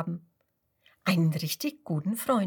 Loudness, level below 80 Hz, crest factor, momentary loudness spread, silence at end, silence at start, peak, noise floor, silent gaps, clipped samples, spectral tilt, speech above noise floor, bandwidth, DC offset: -29 LUFS; -74 dBFS; 18 dB; 9 LU; 0 s; 0 s; -12 dBFS; -75 dBFS; none; under 0.1%; -5.5 dB/octave; 47 dB; 19 kHz; under 0.1%